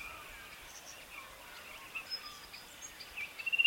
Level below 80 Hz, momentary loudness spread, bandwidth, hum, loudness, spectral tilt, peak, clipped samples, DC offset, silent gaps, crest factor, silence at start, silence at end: -66 dBFS; 9 LU; over 20 kHz; none; -44 LUFS; 0.5 dB/octave; -14 dBFS; under 0.1%; under 0.1%; none; 26 dB; 0 s; 0 s